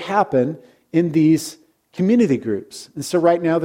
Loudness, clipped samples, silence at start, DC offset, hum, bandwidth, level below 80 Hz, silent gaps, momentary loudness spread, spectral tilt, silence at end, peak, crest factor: -19 LUFS; under 0.1%; 0 s; under 0.1%; none; 16 kHz; -62 dBFS; none; 16 LU; -6.5 dB/octave; 0 s; -2 dBFS; 16 dB